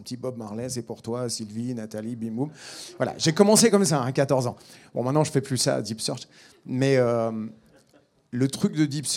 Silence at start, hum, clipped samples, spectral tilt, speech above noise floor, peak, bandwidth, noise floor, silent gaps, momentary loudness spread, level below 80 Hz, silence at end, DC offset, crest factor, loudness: 0 s; none; under 0.1%; -4.5 dB/octave; 36 dB; -2 dBFS; 18 kHz; -61 dBFS; none; 15 LU; -68 dBFS; 0 s; under 0.1%; 22 dB; -25 LUFS